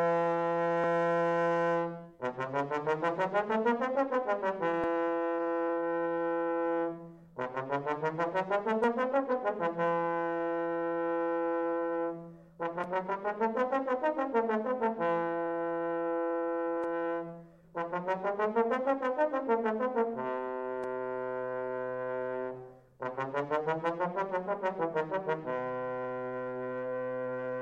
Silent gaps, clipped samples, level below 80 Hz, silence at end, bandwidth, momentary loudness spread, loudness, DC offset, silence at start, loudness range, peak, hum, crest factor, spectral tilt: none; under 0.1%; -72 dBFS; 0 s; 7.6 kHz; 8 LU; -32 LUFS; under 0.1%; 0 s; 4 LU; -16 dBFS; none; 16 dB; -7.5 dB/octave